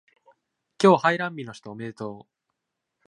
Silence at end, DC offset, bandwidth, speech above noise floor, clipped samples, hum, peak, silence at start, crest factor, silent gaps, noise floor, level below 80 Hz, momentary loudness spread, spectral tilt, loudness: 0.9 s; under 0.1%; 10.5 kHz; 59 dB; under 0.1%; none; -2 dBFS; 0.8 s; 24 dB; none; -82 dBFS; -74 dBFS; 19 LU; -6 dB/octave; -22 LUFS